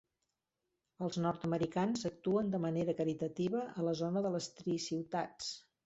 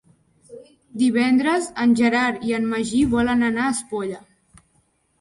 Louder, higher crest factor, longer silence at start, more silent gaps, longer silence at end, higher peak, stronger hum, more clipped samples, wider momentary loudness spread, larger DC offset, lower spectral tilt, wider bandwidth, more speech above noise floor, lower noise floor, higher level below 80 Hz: second, -37 LUFS vs -20 LUFS; about the same, 16 dB vs 16 dB; first, 1 s vs 0.5 s; neither; second, 0.25 s vs 1.05 s; second, -20 dBFS vs -6 dBFS; neither; neither; second, 5 LU vs 11 LU; neither; first, -6 dB/octave vs -4.5 dB/octave; second, 8 kHz vs 11.5 kHz; first, 51 dB vs 45 dB; first, -88 dBFS vs -64 dBFS; second, -72 dBFS vs -50 dBFS